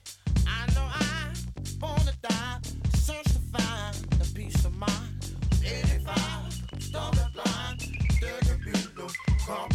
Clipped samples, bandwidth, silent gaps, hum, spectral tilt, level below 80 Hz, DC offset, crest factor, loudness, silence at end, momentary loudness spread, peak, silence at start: under 0.1%; 15 kHz; none; none; -5 dB/octave; -30 dBFS; under 0.1%; 14 dB; -29 LUFS; 0 s; 8 LU; -14 dBFS; 0.05 s